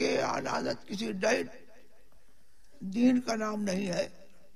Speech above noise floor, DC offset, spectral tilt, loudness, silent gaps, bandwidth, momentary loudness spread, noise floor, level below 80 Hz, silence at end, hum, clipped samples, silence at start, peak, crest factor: 35 dB; 0.5%; -4.5 dB/octave; -31 LUFS; none; 13 kHz; 11 LU; -65 dBFS; -64 dBFS; 0.3 s; none; under 0.1%; 0 s; -14 dBFS; 18 dB